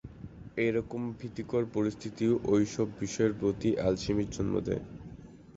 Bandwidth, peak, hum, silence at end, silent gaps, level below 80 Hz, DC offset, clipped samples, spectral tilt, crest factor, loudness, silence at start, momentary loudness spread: 8 kHz; -14 dBFS; none; 0.05 s; none; -52 dBFS; under 0.1%; under 0.1%; -6.5 dB/octave; 18 dB; -31 LUFS; 0.05 s; 17 LU